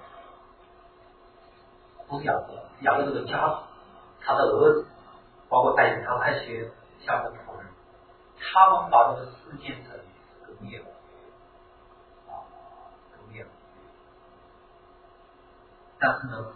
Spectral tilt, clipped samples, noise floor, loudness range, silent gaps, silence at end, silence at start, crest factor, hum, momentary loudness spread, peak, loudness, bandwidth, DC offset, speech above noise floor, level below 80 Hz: -9 dB/octave; under 0.1%; -55 dBFS; 20 LU; none; 0.05 s; 0.05 s; 24 dB; none; 26 LU; -4 dBFS; -24 LUFS; 4.5 kHz; under 0.1%; 31 dB; -60 dBFS